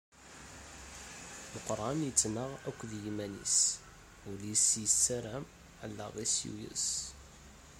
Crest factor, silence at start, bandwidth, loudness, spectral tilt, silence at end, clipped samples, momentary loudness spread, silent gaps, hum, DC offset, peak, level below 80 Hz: 26 dB; 0.15 s; 16 kHz; -32 LUFS; -2 dB/octave; 0 s; under 0.1%; 21 LU; none; none; under 0.1%; -12 dBFS; -60 dBFS